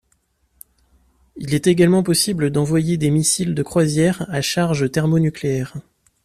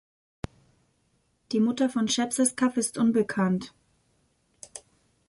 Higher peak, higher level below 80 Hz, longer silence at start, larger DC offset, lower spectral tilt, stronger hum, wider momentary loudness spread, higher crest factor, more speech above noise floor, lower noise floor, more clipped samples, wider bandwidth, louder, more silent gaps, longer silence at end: first, -2 dBFS vs -10 dBFS; first, -50 dBFS vs -58 dBFS; second, 1.35 s vs 1.5 s; neither; about the same, -5 dB/octave vs -4.5 dB/octave; neither; second, 8 LU vs 20 LU; about the same, 16 dB vs 18 dB; about the same, 47 dB vs 45 dB; second, -65 dBFS vs -70 dBFS; neither; first, 14.5 kHz vs 12 kHz; first, -18 LUFS vs -26 LUFS; neither; about the same, 0.45 s vs 0.5 s